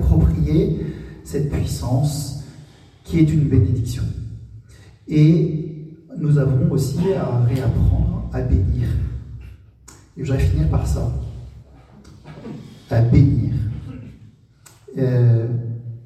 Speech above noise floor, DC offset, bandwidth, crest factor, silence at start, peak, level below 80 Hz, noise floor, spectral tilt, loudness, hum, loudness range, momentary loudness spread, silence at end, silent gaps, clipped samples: 32 dB; under 0.1%; 13.5 kHz; 18 dB; 0 s; -2 dBFS; -28 dBFS; -49 dBFS; -8.5 dB/octave; -19 LUFS; none; 4 LU; 20 LU; 0 s; none; under 0.1%